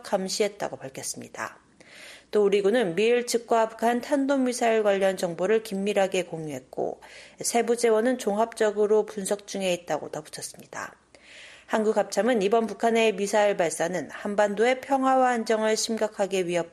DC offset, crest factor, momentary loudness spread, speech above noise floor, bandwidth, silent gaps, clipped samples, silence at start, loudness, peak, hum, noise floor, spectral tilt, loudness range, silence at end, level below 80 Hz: under 0.1%; 16 dB; 13 LU; 24 dB; 13.5 kHz; none; under 0.1%; 0.05 s; -25 LUFS; -8 dBFS; none; -49 dBFS; -4 dB/octave; 4 LU; 0.05 s; -70 dBFS